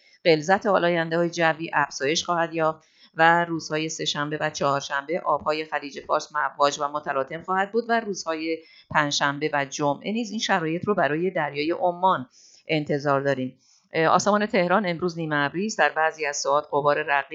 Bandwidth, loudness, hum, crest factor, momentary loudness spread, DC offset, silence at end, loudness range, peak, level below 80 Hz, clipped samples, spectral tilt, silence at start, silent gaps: 8 kHz; -24 LUFS; none; 22 dB; 7 LU; under 0.1%; 0 s; 3 LU; -4 dBFS; -68 dBFS; under 0.1%; -4 dB/octave; 0.25 s; none